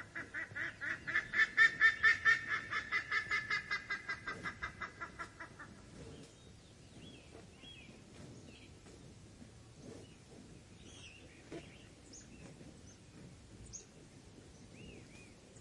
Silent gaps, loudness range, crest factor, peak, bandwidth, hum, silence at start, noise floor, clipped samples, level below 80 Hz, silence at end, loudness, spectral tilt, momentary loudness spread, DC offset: none; 24 LU; 24 dB; -16 dBFS; 11.5 kHz; none; 0 s; -59 dBFS; under 0.1%; -66 dBFS; 0 s; -34 LUFS; -2.5 dB/octave; 28 LU; under 0.1%